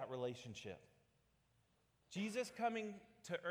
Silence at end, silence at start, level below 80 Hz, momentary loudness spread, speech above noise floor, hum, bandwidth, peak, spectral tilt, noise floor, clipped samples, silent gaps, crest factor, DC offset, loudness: 0 s; 0 s; -84 dBFS; 12 LU; 33 dB; none; over 20 kHz; -28 dBFS; -5 dB/octave; -79 dBFS; under 0.1%; none; 18 dB; under 0.1%; -46 LUFS